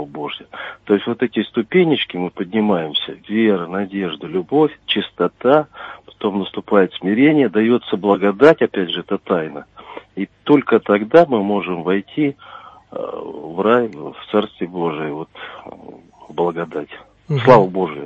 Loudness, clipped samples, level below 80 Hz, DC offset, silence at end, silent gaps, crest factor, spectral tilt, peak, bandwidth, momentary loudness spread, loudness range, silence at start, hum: -17 LUFS; under 0.1%; -58 dBFS; under 0.1%; 0 s; none; 18 dB; -8 dB/octave; 0 dBFS; 7.4 kHz; 19 LU; 6 LU; 0 s; none